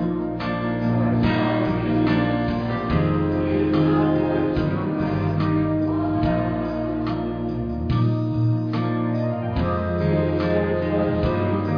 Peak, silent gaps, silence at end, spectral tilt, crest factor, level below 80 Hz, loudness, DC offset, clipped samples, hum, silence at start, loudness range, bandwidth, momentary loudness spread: -8 dBFS; none; 0 s; -10 dB/octave; 12 dB; -38 dBFS; -22 LUFS; under 0.1%; under 0.1%; none; 0 s; 2 LU; 5.4 kHz; 5 LU